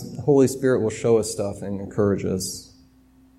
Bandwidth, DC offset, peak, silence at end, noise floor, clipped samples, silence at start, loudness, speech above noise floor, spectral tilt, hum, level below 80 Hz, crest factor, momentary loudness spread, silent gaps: 15.5 kHz; under 0.1%; -6 dBFS; 0.75 s; -54 dBFS; under 0.1%; 0 s; -22 LUFS; 33 dB; -6 dB/octave; none; -54 dBFS; 18 dB; 11 LU; none